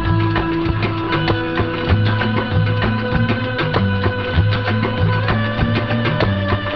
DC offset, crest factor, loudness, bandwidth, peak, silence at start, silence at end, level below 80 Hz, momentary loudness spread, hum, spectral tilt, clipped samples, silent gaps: 0.8%; 14 dB; -18 LUFS; 5.8 kHz; -4 dBFS; 0 s; 0 s; -28 dBFS; 2 LU; none; -9 dB/octave; under 0.1%; none